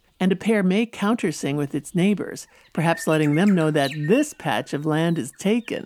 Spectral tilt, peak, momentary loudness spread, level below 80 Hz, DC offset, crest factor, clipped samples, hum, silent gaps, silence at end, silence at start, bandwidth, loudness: -6 dB/octave; -6 dBFS; 7 LU; -64 dBFS; under 0.1%; 16 dB; under 0.1%; none; none; 0.05 s; 0.2 s; 15 kHz; -22 LUFS